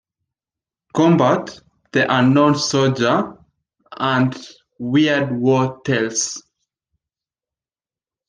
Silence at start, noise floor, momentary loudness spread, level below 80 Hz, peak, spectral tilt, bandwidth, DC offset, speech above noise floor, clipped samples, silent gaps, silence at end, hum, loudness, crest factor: 0.95 s; under -90 dBFS; 12 LU; -60 dBFS; -2 dBFS; -5 dB/octave; 10 kHz; under 0.1%; over 73 dB; under 0.1%; none; 1.9 s; none; -17 LUFS; 16 dB